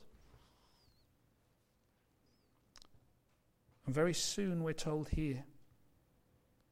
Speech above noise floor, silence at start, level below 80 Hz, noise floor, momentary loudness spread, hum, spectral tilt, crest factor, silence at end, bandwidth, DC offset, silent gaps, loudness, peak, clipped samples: 39 dB; 0 s; -56 dBFS; -76 dBFS; 8 LU; none; -4.5 dB/octave; 20 dB; 1.1 s; 16 kHz; under 0.1%; none; -38 LUFS; -22 dBFS; under 0.1%